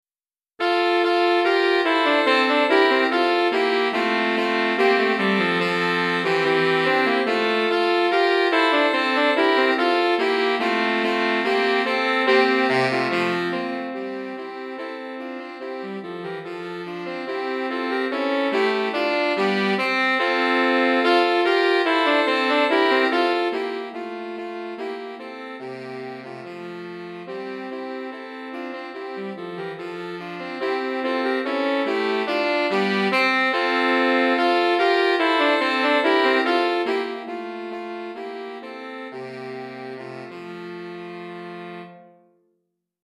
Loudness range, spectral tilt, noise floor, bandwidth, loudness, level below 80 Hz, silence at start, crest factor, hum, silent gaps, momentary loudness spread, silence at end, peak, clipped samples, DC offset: 15 LU; -5 dB/octave; under -90 dBFS; 12.5 kHz; -20 LUFS; -76 dBFS; 0.6 s; 18 dB; none; none; 16 LU; 1 s; -4 dBFS; under 0.1%; under 0.1%